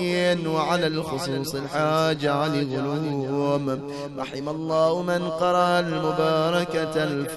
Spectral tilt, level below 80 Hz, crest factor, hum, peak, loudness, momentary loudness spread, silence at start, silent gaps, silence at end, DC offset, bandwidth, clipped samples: -5.5 dB/octave; -58 dBFS; 16 dB; none; -8 dBFS; -24 LUFS; 8 LU; 0 s; none; 0 s; under 0.1%; 12 kHz; under 0.1%